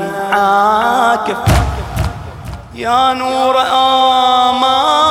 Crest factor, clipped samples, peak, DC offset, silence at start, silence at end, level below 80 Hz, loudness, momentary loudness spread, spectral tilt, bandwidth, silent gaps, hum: 10 dB; under 0.1%; -2 dBFS; under 0.1%; 0 s; 0 s; -26 dBFS; -12 LUFS; 12 LU; -4.5 dB/octave; 16.5 kHz; none; none